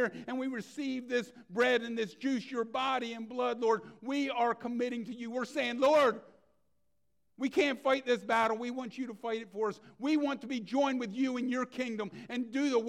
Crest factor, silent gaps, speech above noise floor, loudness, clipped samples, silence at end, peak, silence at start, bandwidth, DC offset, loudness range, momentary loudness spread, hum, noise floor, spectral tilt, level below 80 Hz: 16 dB; none; 49 dB; -33 LUFS; under 0.1%; 0 s; -16 dBFS; 0 s; 13.5 kHz; under 0.1%; 3 LU; 10 LU; none; -82 dBFS; -4.5 dB/octave; -78 dBFS